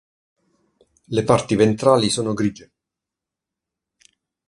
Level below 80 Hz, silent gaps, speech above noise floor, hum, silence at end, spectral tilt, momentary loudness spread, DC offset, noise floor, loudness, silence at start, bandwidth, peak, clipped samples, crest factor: -54 dBFS; none; 68 dB; none; 1.95 s; -5.5 dB/octave; 8 LU; under 0.1%; -86 dBFS; -19 LUFS; 1.1 s; 11.5 kHz; 0 dBFS; under 0.1%; 22 dB